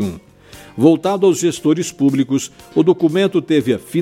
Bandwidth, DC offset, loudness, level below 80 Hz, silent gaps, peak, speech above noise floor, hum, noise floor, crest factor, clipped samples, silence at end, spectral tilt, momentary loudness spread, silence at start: 15.5 kHz; under 0.1%; -16 LUFS; -54 dBFS; none; 0 dBFS; 26 dB; none; -41 dBFS; 16 dB; under 0.1%; 0 s; -6 dB/octave; 7 LU; 0 s